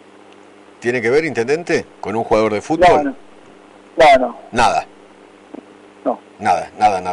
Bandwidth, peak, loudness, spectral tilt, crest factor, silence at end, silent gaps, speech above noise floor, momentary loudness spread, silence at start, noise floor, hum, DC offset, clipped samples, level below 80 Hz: 11 kHz; -4 dBFS; -16 LUFS; -4.5 dB/octave; 14 dB; 0 s; none; 28 dB; 13 LU; 0.8 s; -43 dBFS; none; under 0.1%; under 0.1%; -44 dBFS